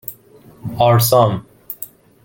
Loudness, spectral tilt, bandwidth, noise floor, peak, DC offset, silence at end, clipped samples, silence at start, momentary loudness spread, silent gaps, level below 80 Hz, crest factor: -14 LUFS; -5.5 dB/octave; 17 kHz; -45 dBFS; 0 dBFS; under 0.1%; 0.4 s; under 0.1%; 0.1 s; 21 LU; none; -50 dBFS; 18 dB